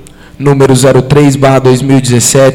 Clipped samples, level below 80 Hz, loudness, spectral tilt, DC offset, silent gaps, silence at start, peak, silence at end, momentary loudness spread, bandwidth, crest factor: 1%; -34 dBFS; -6 LUFS; -5.5 dB/octave; under 0.1%; none; 0.4 s; 0 dBFS; 0 s; 3 LU; 16.5 kHz; 6 dB